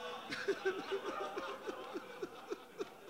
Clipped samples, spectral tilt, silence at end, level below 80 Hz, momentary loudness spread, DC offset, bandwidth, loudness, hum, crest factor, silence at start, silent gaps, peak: under 0.1%; -3.5 dB/octave; 0 s; -82 dBFS; 10 LU; under 0.1%; 16 kHz; -43 LUFS; none; 18 dB; 0 s; none; -24 dBFS